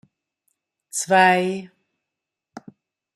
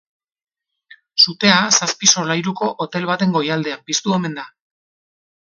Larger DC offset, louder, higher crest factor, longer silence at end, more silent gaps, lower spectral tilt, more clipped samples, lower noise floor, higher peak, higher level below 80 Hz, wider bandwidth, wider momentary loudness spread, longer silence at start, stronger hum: neither; second, -19 LUFS vs -16 LUFS; about the same, 20 dB vs 20 dB; second, 0.55 s vs 1 s; neither; about the same, -3.5 dB/octave vs -2.5 dB/octave; neither; first, -85 dBFS vs -49 dBFS; second, -4 dBFS vs 0 dBFS; second, -74 dBFS vs -64 dBFS; first, 14 kHz vs 10 kHz; first, 15 LU vs 11 LU; second, 0.95 s vs 1.15 s; neither